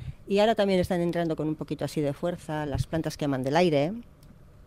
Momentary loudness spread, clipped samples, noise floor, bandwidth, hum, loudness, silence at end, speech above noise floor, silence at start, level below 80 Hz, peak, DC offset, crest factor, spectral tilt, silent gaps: 9 LU; under 0.1%; -51 dBFS; 16 kHz; none; -27 LUFS; 0.25 s; 25 dB; 0 s; -50 dBFS; -12 dBFS; under 0.1%; 16 dB; -6.5 dB/octave; none